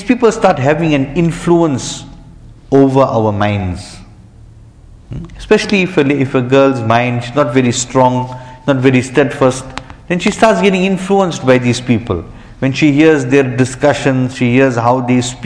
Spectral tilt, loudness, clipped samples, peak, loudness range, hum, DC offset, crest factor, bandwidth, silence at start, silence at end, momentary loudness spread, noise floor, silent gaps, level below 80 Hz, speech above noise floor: -6 dB/octave; -12 LUFS; 0.1%; 0 dBFS; 4 LU; none; under 0.1%; 12 dB; 10.5 kHz; 0 s; 0 s; 12 LU; -38 dBFS; none; -38 dBFS; 26 dB